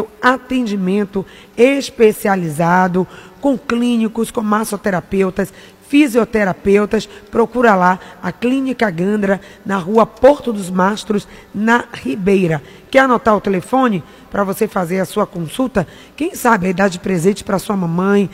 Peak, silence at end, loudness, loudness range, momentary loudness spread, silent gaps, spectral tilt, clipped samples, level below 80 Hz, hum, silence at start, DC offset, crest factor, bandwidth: 0 dBFS; 0 s; -16 LUFS; 2 LU; 9 LU; none; -6 dB/octave; under 0.1%; -46 dBFS; none; 0 s; under 0.1%; 16 dB; 16 kHz